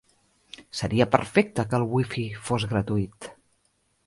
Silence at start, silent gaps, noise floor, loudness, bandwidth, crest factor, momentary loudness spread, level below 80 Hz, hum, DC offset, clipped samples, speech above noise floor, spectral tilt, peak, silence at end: 0.6 s; none; -69 dBFS; -26 LUFS; 11.5 kHz; 24 dB; 22 LU; -52 dBFS; none; under 0.1%; under 0.1%; 45 dB; -6 dB/octave; -2 dBFS; 0.75 s